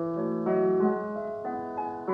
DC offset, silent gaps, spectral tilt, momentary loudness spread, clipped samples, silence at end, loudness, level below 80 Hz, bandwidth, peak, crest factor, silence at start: under 0.1%; none; -10.5 dB/octave; 9 LU; under 0.1%; 0 s; -29 LUFS; -68 dBFS; 4.7 kHz; -14 dBFS; 14 dB; 0 s